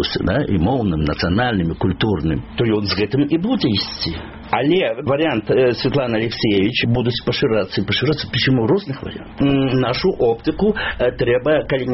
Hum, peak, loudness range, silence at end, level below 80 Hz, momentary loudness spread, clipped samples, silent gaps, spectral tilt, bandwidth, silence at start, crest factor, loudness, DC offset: none; -2 dBFS; 1 LU; 0 s; -38 dBFS; 4 LU; under 0.1%; none; -4.5 dB/octave; 6 kHz; 0 s; 16 dB; -18 LUFS; 0.1%